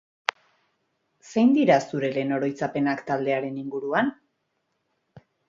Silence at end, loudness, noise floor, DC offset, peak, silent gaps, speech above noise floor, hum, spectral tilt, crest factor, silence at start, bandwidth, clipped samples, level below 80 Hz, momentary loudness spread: 0.3 s; -24 LUFS; -75 dBFS; under 0.1%; 0 dBFS; none; 52 dB; none; -6 dB/octave; 26 dB; 1.25 s; 7.6 kHz; under 0.1%; -70 dBFS; 11 LU